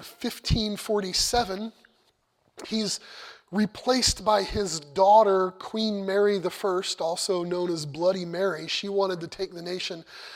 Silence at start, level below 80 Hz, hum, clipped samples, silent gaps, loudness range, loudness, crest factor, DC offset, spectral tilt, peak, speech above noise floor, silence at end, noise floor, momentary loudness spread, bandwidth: 0 s; -46 dBFS; none; under 0.1%; none; 5 LU; -26 LUFS; 20 dB; under 0.1%; -4 dB/octave; -6 dBFS; 43 dB; 0 s; -68 dBFS; 12 LU; 16.5 kHz